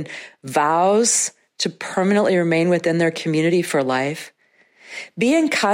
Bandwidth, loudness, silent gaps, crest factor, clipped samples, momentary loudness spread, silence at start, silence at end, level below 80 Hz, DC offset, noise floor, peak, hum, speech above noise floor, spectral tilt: 16 kHz; -19 LUFS; none; 14 dB; under 0.1%; 17 LU; 0 s; 0 s; -70 dBFS; under 0.1%; -54 dBFS; -4 dBFS; none; 35 dB; -4 dB/octave